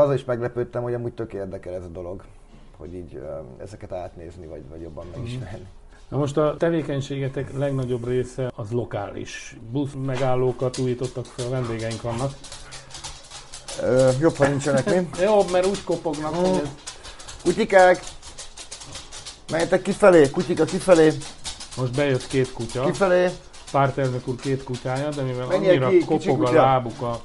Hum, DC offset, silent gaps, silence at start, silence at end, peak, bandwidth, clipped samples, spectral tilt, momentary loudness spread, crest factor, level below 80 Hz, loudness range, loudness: none; under 0.1%; none; 0 s; 0 s; -2 dBFS; 11.5 kHz; under 0.1%; -6 dB/octave; 20 LU; 22 dB; -46 dBFS; 13 LU; -22 LUFS